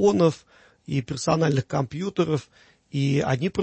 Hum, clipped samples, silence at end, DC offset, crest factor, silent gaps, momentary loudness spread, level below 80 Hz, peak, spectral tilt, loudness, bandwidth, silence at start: none; under 0.1%; 0 s; under 0.1%; 16 dB; none; 8 LU; -54 dBFS; -8 dBFS; -6.5 dB/octave; -25 LUFS; 8.6 kHz; 0 s